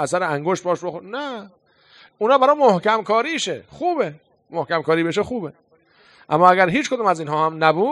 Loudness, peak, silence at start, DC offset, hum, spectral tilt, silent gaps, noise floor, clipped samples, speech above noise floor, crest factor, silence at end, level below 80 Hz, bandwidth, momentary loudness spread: -19 LUFS; 0 dBFS; 0 s; under 0.1%; none; -5 dB/octave; none; -55 dBFS; under 0.1%; 36 dB; 20 dB; 0 s; -62 dBFS; 11.5 kHz; 14 LU